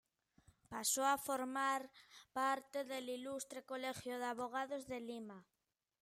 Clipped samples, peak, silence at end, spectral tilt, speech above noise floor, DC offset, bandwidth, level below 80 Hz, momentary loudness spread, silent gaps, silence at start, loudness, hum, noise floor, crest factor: under 0.1%; -24 dBFS; 0.6 s; -2 dB/octave; over 48 dB; under 0.1%; 16 kHz; -82 dBFS; 15 LU; none; 0.7 s; -42 LUFS; none; under -90 dBFS; 20 dB